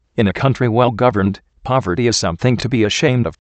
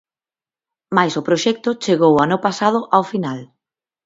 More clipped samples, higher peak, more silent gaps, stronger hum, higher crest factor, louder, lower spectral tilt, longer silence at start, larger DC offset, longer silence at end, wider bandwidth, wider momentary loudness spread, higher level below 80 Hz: neither; about the same, 0 dBFS vs 0 dBFS; neither; neither; about the same, 16 dB vs 18 dB; about the same, -16 LUFS vs -17 LUFS; about the same, -5.5 dB/octave vs -5.5 dB/octave; second, 0.15 s vs 0.9 s; neither; second, 0.2 s vs 0.6 s; first, 8.8 kHz vs 7.8 kHz; second, 5 LU vs 9 LU; first, -44 dBFS vs -62 dBFS